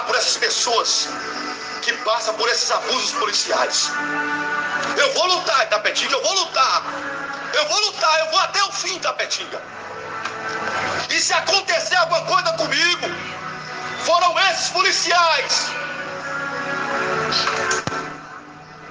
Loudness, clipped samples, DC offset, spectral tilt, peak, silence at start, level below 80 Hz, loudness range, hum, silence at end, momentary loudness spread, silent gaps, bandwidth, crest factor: -19 LUFS; under 0.1%; under 0.1%; -0.5 dB/octave; -4 dBFS; 0 s; -64 dBFS; 3 LU; none; 0 s; 12 LU; none; 10.5 kHz; 18 dB